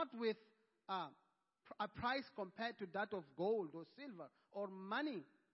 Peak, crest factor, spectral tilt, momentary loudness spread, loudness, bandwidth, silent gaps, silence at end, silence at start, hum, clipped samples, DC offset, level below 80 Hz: -28 dBFS; 18 dB; -3 dB/octave; 13 LU; -46 LUFS; 5.6 kHz; none; 0.3 s; 0 s; none; under 0.1%; under 0.1%; -78 dBFS